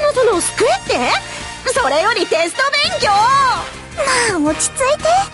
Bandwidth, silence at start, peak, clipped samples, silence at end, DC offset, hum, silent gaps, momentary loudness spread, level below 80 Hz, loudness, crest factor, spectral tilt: 12 kHz; 0 s; -4 dBFS; under 0.1%; 0 s; under 0.1%; none; none; 6 LU; -40 dBFS; -15 LUFS; 12 dB; -2 dB/octave